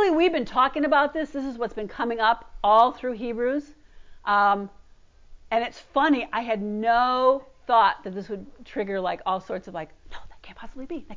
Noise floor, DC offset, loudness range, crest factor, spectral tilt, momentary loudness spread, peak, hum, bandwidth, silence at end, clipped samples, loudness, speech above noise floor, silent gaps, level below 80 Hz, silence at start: -52 dBFS; under 0.1%; 4 LU; 18 dB; -6 dB/octave; 17 LU; -6 dBFS; none; 7.6 kHz; 0 s; under 0.1%; -24 LUFS; 28 dB; none; -52 dBFS; 0 s